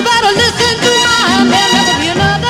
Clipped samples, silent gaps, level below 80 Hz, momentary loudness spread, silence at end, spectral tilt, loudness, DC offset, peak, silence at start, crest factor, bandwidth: under 0.1%; none; -36 dBFS; 3 LU; 0 s; -3 dB/octave; -9 LUFS; under 0.1%; 0 dBFS; 0 s; 10 dB; 16.5 kHz